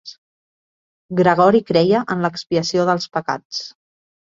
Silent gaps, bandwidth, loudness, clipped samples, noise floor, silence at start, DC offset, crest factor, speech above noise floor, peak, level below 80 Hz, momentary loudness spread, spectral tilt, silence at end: 0.18-1.09 s, 3.45-3.50 s; 7.6 kHz; -18 LUFS; under 0.1%; under -90 dBFS; 0.05 s; under 0.1%; 18 dB; over 73 dB; -2 dBFS; -58 dBFS; 12 LU; -5.5 dB/octave; 0.65 s